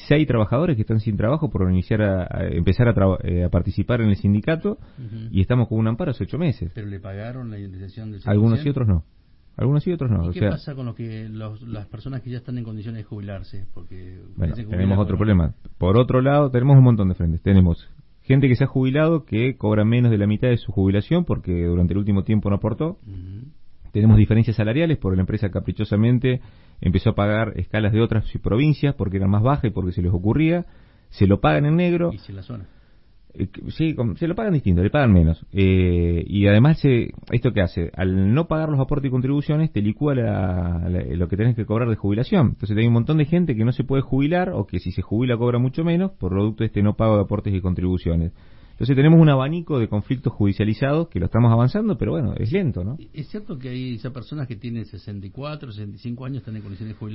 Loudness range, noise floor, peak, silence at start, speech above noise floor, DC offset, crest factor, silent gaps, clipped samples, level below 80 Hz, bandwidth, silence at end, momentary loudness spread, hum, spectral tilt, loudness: 7 LU; -50 dBFS; -4 dBFS; 0 s; 30 dB; under 0.1%; 16 dB; none; under 0.1%; -38 dBFS; 5.8 kHz; 0 s; 16 LU; none; -13 dB/octave; -20 LUFS